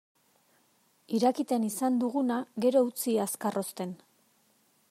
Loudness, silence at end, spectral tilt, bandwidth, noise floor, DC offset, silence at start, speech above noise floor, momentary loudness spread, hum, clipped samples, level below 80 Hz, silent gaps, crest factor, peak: -29 LUFS; 0.95 s; -5 dB/octave; 16 kHz; -68 dBFS; under 0.1%; 1.1 s; 40 dB; 10 LU; none; under 0.1%; -84 dBFS; none; 18 dB; -14 dBFS